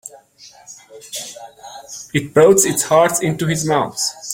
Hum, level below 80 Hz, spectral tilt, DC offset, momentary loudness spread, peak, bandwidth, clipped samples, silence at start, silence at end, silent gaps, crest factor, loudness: none; -54 dBFS; -4 dB/octave; under 0.1%; 25 LU; 0 dBFS; 17 kHz; under 0.1%; 0.05 s; 0 s; none; 18 dB; -15 LUFS